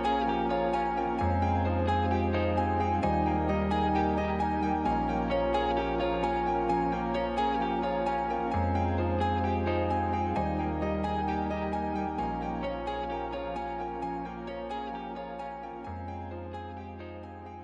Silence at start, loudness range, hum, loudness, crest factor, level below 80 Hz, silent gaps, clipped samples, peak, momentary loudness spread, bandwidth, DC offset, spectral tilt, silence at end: 0 s; 9 LU; none; -30 LUFS; 14 dB; -42 dBFS; none; under 0.1%; -16 dBFS; 11 LU; 7.6 kHz; under 0.1%; -8 dB/octave; 0 s